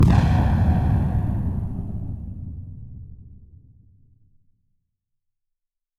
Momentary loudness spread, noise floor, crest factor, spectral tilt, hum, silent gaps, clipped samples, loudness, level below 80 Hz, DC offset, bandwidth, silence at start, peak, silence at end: 22 LU; -80 dBFS; 20 dB; -9 dB/octave; none; none; under 0.1%; -22 LUFS; -30 dBFS; under 0.1%; 8.2 kHz; 0 s; -4 dBFS; 2.55 s